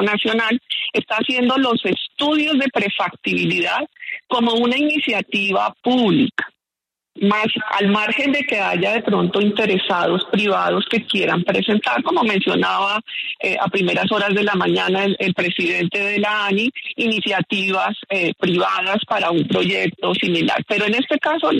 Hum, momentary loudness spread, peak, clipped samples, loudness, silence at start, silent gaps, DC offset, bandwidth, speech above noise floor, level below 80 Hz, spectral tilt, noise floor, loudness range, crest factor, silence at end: none; 4 LU; -4 dBFS; under 0.1%; -18 LUFS; 0 s; none; under 0.1%; 11.5 kHz; 67 dB; -62 dBFS; -5.5 dB/octave; -86 dBFS; 1 LU; 14 dB; 0 s